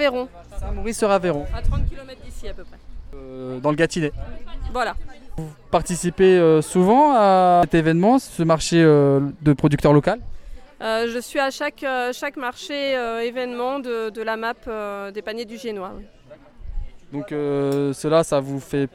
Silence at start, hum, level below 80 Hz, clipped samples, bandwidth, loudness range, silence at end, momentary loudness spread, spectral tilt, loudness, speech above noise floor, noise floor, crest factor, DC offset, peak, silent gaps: 0 s; none; -34 dBFS; under 0.1%; 16.5 kHz; 11 LU; 0.05 s; 21 LU; -6 dB/octave; -20 LUFS; 24 dB; -44 dBFS; 18 dB; under 0.1%; -2 dBFS; none